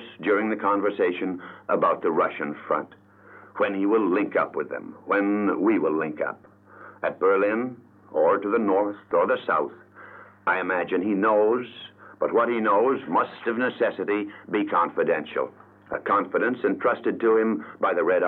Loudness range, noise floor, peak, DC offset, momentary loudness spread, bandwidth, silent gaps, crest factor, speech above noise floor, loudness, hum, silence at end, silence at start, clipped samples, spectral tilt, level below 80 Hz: 2 LU; -50 dBFS; -10 dBFS; under 0.1%; 10 LU; 4.3 kHz; none; 14 dB; 26 dB; -24 LUFS; none; 0 s; 0 s; under 0.1%; -9 dB/octave; -74 dBFS